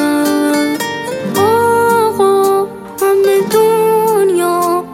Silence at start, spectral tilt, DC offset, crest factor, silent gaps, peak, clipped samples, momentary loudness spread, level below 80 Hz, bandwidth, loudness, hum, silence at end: 0 s; -4.5 dB/octave; under 0.1%; 10 dB; none; 0 dBFS; under 0.1%; 7 LU; -58 dBFS; 16.5 kHz; -12 LUFS; none; 0 s